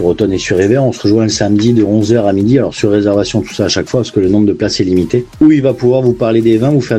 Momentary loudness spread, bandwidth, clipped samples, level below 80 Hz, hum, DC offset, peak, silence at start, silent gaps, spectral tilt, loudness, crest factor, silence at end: 4 LU; 9.6 kHz; under 0.1%; -40 dBFS; none; under 0.1%; 0 dBFS; 0 s; none; -6 dB/octave; -11 LUFS; 10 dB; 0 s